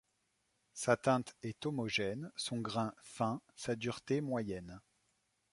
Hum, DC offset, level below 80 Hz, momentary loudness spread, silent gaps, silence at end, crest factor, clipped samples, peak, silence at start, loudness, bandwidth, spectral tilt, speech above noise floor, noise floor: none; under 0.1%; -70 dBFS; 12 LU; none; 0.75 s; 24 dB; under 0.1%; -16 dBFS; 0.75 s; -38 LUFS; 11.5 kHz; -5 dB/octave; 43 dB; -80 dBFS